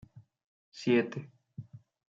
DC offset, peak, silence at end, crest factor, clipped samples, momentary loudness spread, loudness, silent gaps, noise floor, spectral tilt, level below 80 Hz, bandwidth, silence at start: under 0.1%; -16 dBFS; 0.35 s; 20 dB; under 0.1%; 24 LU; -31 LUFS; 0.44-0.72 s; -49 dBFS; -6.5 dB/octave; -76 dBFS; 7.6 kHz; 0.15 s